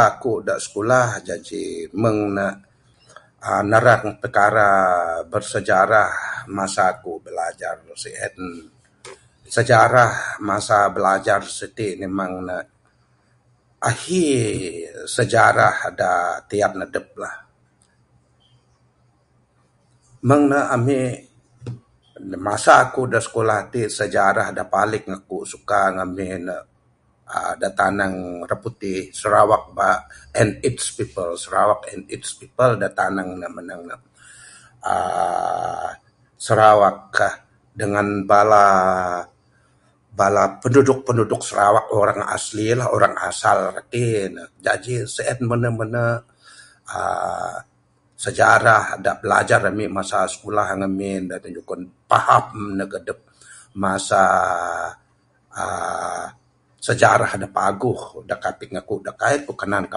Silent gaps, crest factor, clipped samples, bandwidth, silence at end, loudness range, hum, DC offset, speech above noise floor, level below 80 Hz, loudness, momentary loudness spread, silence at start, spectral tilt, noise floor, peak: none; 20 dB; under 0.1%; 11.5 kHz; 0 s; 7 LU; none; under 0.1%; 41 dB; -52 dBFS; -19 LUFS; 16 LU; 0 s; -5 dB/octave; -61 dBFS; 0 dBFS